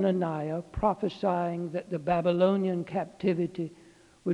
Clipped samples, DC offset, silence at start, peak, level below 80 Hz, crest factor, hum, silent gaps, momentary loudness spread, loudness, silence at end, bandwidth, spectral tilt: under 0.1%; under 0.1%; 0 s; -12 dBFS; -54 dBFS; 18 dB; none; none; 9 LU; -29 LUFS; 0 s; 10 kHz; -8.5 dB/octave